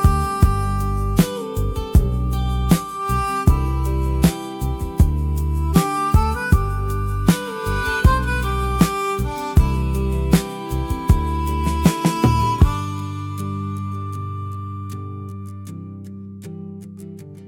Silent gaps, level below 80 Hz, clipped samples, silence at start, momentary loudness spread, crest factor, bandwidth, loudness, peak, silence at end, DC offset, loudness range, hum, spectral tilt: none; -24 dBFS; under 0.1%; 0 s; 15 LU; 16 dB; 18 kHz; -20 LUFS; -2 dBFS; 0 s; under 0.1%; 9 LU; none; -6.5 dB/octave